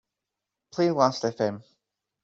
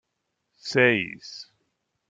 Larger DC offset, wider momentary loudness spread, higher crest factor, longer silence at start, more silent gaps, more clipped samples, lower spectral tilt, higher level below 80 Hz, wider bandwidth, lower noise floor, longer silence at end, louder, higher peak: neither; second, 15 LU vs 20 LU; about the same, 22 dB vs 22 dB; about the same, 0.75 s vs 0.65 s; neither; neither; about the same, -5.5 dB/octave vs -5 dB/octave; about the same, -70 dBFS vs -70 dBFS; second, 7.8 kHz vs 9.2 kHz; first, -86 dBFS vs -79 dBFS; about the same, 0.65 s vs 0.7 s; second, -25 LUFS vs -22 LUFS; about the same, -6 dBFS vs -6 dBFS